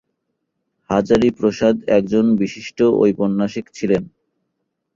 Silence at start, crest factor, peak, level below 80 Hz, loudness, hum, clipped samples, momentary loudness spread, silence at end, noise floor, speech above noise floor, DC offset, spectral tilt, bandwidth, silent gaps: 0.9 s; 16 dB; -2 dBFS; -50 dBFS; -18 LUFS; none; under 0.1%; 7 LU; 0.9 s; -74 dBFS; 58 dB; under 0.1%; -7 dB/octave; 7.6 kHz; none